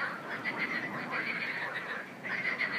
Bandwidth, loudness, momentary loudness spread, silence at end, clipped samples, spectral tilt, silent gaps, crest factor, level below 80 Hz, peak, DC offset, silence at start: 15.5 kHz; -34 LUFS; 4 LU; 0 s; under 0.1%; -4.5 dB/octave; none; 16 dB; -82 dBFS; -20 dBFS; under 0.1%; 0 s